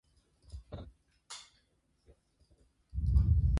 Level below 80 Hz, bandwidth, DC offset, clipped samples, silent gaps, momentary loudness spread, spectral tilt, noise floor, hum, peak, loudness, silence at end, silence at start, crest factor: -36 dBFS; 11.5 kHz; under 0.1%; under 0.1%; none; 25 LU; -7 dB/octave; -74 dBFS; none; -16 dBFS; -32 LUFS; 0 s; 0.55 s; 18 dB